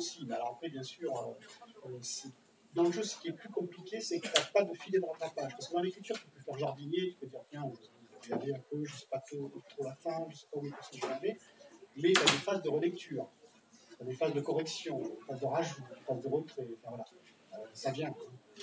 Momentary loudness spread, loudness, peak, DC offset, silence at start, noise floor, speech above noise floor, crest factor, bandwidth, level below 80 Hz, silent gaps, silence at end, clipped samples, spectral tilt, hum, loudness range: 16 LU; -37 LUFS; -10 dBFS; under 0.1%; 0 s; -62 dBFS; 25 dB; 28 dB; 8 kHz; -88 dBFS; none; 0 s; under 0.1%; -4 dB/octave; none; 8 LU